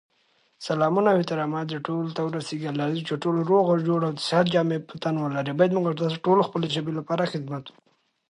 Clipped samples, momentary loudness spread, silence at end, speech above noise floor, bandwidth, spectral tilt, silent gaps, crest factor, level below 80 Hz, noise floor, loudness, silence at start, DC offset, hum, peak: under 0.1%; 8 LU; 0.6 s; 42 dB; 11 kHz; -6.5 dB/octave; none; 18 dB; -72 dBFS; -66 dBFS; -25 LUFS; 0.6 s; under 0.1%; none; -6 dBFS